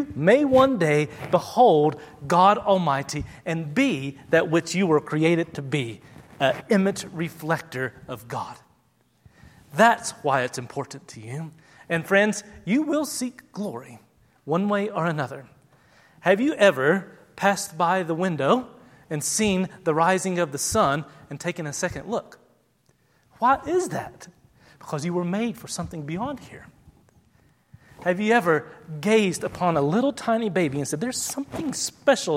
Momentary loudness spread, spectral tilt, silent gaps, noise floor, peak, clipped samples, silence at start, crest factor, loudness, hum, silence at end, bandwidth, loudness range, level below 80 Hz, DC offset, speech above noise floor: 15 LU; -5 dB/octave; none; -64 dBFS; -2 dBFS; under 0.1%; 0 s; 22 dB; -23 LUFS; none; 0 s; 16.5 kHz; 7 LU; -56 dBFS; under 0.1%; 41 dB